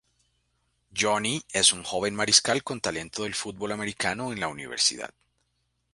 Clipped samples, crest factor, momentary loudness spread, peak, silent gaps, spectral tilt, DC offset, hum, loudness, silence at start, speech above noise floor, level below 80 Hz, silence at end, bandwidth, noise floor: under 0.1%; 26 dB; 12 LU; -4 dBFS; none; -1.5 dB/octave; under 0.1%; 60 Hz at -60 dBFS; -25 LUFS; 0.95 s; 48 dB; -60 dBFS; 0.85 s; 11.5 kHz; -75 dBFS